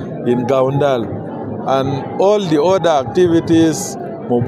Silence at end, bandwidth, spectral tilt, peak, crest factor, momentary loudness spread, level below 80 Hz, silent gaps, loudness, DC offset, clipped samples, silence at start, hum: 0 s; 13.5 kHz; -6 dB/octave; -2 dBFS; 12 dB; 11 LU; -50 dBFS; none; -15 LUFS; under 0.1%; under 0.1%; 0 s; none